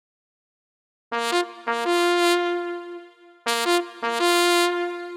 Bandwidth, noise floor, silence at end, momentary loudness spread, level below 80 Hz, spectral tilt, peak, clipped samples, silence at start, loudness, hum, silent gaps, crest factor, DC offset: 17 kHz; -45 dBFS; 0 s; 12 LU; under -90 dBFS; -0.5 dB/octave; -2 dBFS; under 0.1%; 1.1 s; -22 LUFS; none; none; 22 dB; under 0.1%